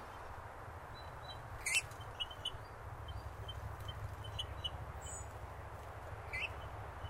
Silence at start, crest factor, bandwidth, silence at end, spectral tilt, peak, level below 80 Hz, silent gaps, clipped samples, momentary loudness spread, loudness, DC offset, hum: 0 s; 26 dB; 16 kHz; 0 s; -2.5 dB/octave; -18 dBFS; -54 dBFS; none; under 0.1%; 12 LU; -44 LUFS; under 0.1%; none